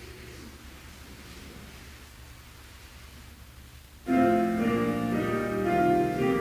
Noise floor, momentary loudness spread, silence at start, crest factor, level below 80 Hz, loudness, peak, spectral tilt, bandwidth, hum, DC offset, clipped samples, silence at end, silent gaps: -49 dBFS; 24 LU; 0 s; 16 dB; -50 dBFS; -26 LUFS; -12 dBFS; -6.5 dB/octave; 16 kHz; none; under 0.1%; under 0.1%; 0 s; none